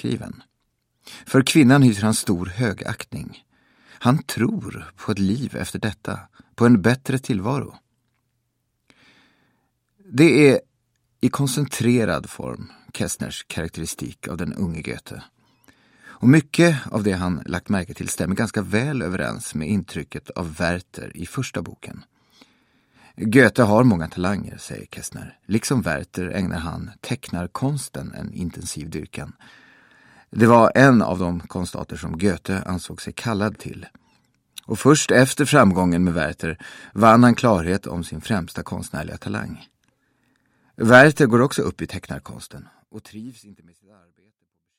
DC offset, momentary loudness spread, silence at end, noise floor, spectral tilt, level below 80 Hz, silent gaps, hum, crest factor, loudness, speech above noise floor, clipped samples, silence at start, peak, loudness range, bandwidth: under 0.1%; 20 LU; 1.25 s; -73 dBFS; -5.5 dB/octave; -48 dBFS; none; none; 22 dB; -20 LUFS; 53 dB; under 0.1%; 0.05 s; 0 dBFS; 10 LU; 16.5 kHz